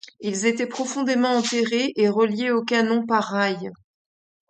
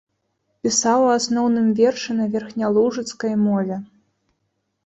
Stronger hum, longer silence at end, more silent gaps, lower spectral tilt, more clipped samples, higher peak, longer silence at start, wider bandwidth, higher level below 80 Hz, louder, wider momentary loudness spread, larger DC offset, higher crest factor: neither; second, 0.75 s vs 1 s; neither; about the same, -4 dB/octave vs -4.5 dB/octave; neither; about the same, -6 dBFS vs -4 dBFS; second, 0.2 s vs 0.65 s; about the same, 9.2 kHz vs 8.4 kHz; second, -72 dBFS vs -64 dBFS; about the same, -22 LUFS vs -20 LUFS; about the same, 6 LU vs 8 LU; neither; about the same, 18 dB vs 16 dB